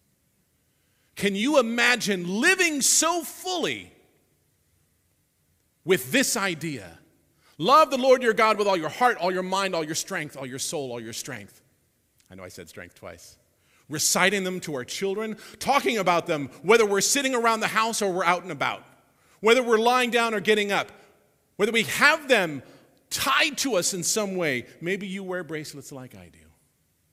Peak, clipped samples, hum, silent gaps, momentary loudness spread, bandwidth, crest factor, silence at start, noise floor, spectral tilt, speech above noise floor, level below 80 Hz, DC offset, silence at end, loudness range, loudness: -2 dBFS; under 0.1%; none; none; 18 LU; 16 kHz; 24 dB; 1.15 s; -69 dBFS; -2.5 dB/octave; 45 dB; -66 dBFS; under 0.1%; 0.85 s; 8 LU; -23 LUFS